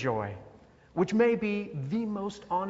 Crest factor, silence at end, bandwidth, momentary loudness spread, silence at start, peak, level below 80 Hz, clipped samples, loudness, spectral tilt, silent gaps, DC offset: 18 dB; 0 s; 8 kHz; 13 LU; 0 s; -12 dBFS; -62 dBFS; under 0.1%; -30 LUFS; -7.5 dB/octave; none; under 0.1%